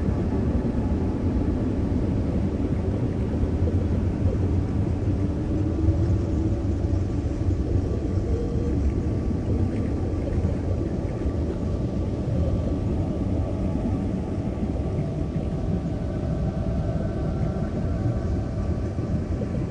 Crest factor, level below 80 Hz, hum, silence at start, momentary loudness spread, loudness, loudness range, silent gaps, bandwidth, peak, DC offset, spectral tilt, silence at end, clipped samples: 14 dB; -30 dBFS; none; 0 s; 3 LU; -26 LUFS; 2 LU; none; 9.2 kHz; -10 dBFS; under 0.1%; -9.5 dB/octave; 0 s; under 0.1%